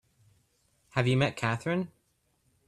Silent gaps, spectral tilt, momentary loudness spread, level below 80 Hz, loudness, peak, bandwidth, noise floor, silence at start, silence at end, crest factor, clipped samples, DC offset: none; -6.5 dB/octave; 8 LU; -64 dBFS; -29 LUFS; -12 dBFS; 11 kHz; -73 dBFS; 0.95 s; 0.8 s; 22 dB; under 0.1%; under 0.1%